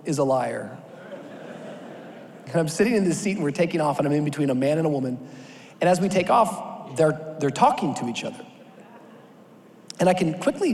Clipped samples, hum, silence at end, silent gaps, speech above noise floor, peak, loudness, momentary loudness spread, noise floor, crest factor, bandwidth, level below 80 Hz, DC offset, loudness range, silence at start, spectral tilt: under 0.1%; none; 0 s; none; 27 dB; -6 dBFS; -23 LUFS; 21 LU; -49 dBFS; 20 dB; 14.5 kHz; -64 dBFS; under 0.1%; 3 LU; 0 s; -6 dB/octave